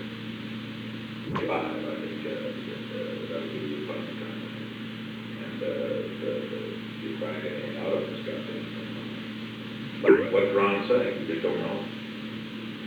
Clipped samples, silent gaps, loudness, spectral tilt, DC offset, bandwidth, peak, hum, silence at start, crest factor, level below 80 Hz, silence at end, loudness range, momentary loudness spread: under 0.1%; none; -30 LUFS; -7 dB/octave; under 0.1%; over 20 kHz; -6 dBFS; none; 0 s; 24 dB; -66 dBFS; 0 s; 8 LU; 13 LU